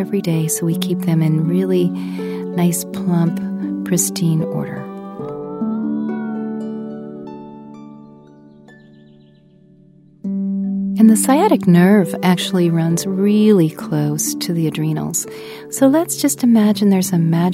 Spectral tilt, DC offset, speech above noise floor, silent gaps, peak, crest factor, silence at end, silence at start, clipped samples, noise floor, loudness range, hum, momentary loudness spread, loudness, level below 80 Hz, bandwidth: -6 dB/octave; under 0.1%; 33 dB; none; 0 dBFS; 16 dB; 0 s; 0 s; under 0.1%; -48 dBFS; 15 LU; none; 16 LU; -17 LUFS; -60 dBFS; 16 kHz